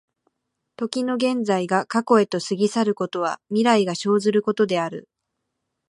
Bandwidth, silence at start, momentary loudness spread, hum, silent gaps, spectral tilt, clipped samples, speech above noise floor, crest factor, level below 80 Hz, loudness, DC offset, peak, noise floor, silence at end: 11.5 kHz; 0.8 s; 7 LU; none; none; -5 dB/octave; under 0.1%; 58 dB; 20 dB; -74 dBFS; -22 LUFS; under 0.1%; -4 dBFS; -79 dBFS; 0.85 s